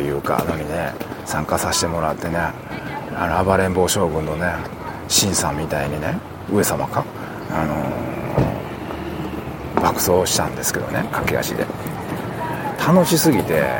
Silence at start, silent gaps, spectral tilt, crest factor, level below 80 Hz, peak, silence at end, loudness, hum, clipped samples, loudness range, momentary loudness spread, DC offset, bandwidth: 0 s; none; -4 dB/octave; 20 dB; -42 dBFS; -2 dBFS; 0 s; -21 LUFS; none; under 0.1%; 3 LU; 12 LU; under 0.1%; 17 kHz